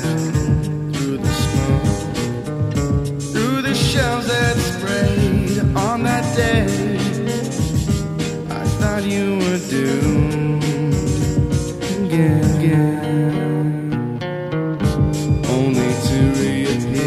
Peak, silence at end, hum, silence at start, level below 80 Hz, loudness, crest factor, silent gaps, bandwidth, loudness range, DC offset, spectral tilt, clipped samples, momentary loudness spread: -4 dBFS; 0 s; none; 0 s; -32 dBFS; -19 LUFS; 14 dB; none; 15 kHz; 2 LU; under 0.1%; -6 dB/octave; under 0.1%; 6 LU